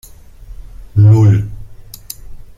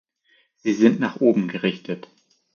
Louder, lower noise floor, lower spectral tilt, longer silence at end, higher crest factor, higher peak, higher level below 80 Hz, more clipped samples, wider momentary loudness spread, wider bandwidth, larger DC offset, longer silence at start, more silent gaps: first, -11 LUFS vs -21 LUFS; second, -34 dBFS vs -63 dBFS; first, -8 dB/octave vs -6.5 dB/octave; second, 0.2 s vs 0.55 s; second, 12 dB vs 20 dB; about the same, -2 dBFS vs -4 dBFS; first, -34 dBFS vs -72 dBFS; neither; first, 23 LU vs 14 LU; first, 15 kHz vs 7 kHz; neither; second, 0.5 s vs 0.65 s; neither